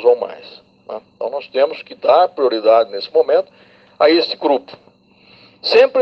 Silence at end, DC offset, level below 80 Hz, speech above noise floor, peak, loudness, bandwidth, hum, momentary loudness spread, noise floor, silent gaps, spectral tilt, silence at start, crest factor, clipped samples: 0 s; under 0.1%; -66 dBFS; 35 dB; 0 dBFS; -16 LUFS; 6.4 kHz; none; 17 LU; -50 dBFS; none; -4.5 dB/octave; 0 s; 16 dB; under 0.1%